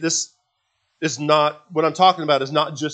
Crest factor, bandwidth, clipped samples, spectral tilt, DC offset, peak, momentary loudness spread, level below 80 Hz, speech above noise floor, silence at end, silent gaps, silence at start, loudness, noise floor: 20 dB; 9.4 kHz; under 0.1%; -3.5 dB/octave; under 0.1%; 0 dBFS; 10 LU; -76 dBFS; 52 dB; 0 s; none; 0 s; -19 LUFS; -71 dBFS